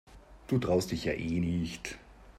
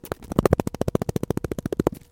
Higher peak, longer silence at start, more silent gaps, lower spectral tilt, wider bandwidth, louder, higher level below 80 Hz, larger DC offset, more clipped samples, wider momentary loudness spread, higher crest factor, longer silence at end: second, -16 dBFS vs 0 dBFS; about the same, 0.1 s vs 0.05 s; neither; about the same, -6 dB/octave vs -7 dB/octave; second, 15 kHz vs 17 kHz; second, -32 LUFS vs -25 LUFS; second, -52 dBFS vs -40 dBFS; neither; neither; first, 15 LU vs 6 LU; second, 18 dB vs 24 dB; second, 0 s vs 0.15 s